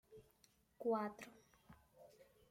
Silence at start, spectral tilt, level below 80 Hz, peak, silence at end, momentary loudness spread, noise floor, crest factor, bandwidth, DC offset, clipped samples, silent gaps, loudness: 0.1 s; -6 dB/octave; -80 dBFS; -30 dBFS; 0.3 s; 26 LU; -75 dBFS; 18 dB; 16.5 kHz; under 0.1%; under 0.1%; none; -43 LUFS